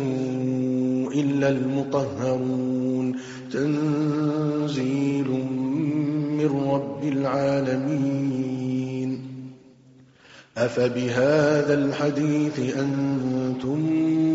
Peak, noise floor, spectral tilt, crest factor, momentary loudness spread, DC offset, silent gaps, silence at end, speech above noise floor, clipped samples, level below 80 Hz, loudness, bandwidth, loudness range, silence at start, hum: -8 dBFS; -53 dBFS; -7 dB/octave; 14 dB; 5 LU; under 0.1%; none; 0 s; 29 dB; under 0.1%; -62 dBFS; -24 LUFS; 7.8 kHz; 4 LU; 0 s; none